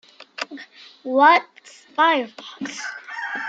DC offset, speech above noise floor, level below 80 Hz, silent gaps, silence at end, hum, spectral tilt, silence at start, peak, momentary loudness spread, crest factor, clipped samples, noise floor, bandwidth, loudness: under 0.1%; 23 dB; -84 dBFS; none; 0 s; none; -2 dB/octave; 0.4 s; -2 dBFS; 20 LU; 20 dB; under 0.1%; -43 dBFS; 9 kHz; -19 LUFS